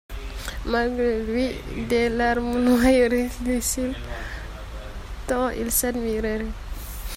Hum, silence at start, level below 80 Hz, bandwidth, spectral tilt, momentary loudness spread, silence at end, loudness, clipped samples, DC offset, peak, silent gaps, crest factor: none; 0.1 s; -34 dBFS; 16.5 kHz; -4 dB/octave; 17 LU; 0 s; -23 LUFS; under 0.1%; under 0.1%; -8 dBFS; none; 16 dB